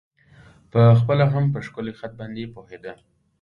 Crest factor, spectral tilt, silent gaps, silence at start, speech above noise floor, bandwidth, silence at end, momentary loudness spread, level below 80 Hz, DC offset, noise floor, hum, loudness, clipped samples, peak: 18 dB; -9.5 dB/octave; none; 0.75 s; 31 dB; 5.4 kHz; 0.45 s; 23 LU; -52 dBFS; under 0.1%; -51 dBFS; none; -19 LUFS; under 0.1%; -4 dBFS